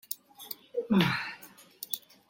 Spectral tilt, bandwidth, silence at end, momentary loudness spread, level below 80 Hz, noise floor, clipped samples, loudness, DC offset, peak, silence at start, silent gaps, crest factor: -5 dB/octave; 17 kHz; 0.3 s; 19 LU; -68 dBFS; -52 dBFS; under 0.1%; -31 LUFS; under 0.1%; -10 dBFS; 0.1 s; none; 24 dB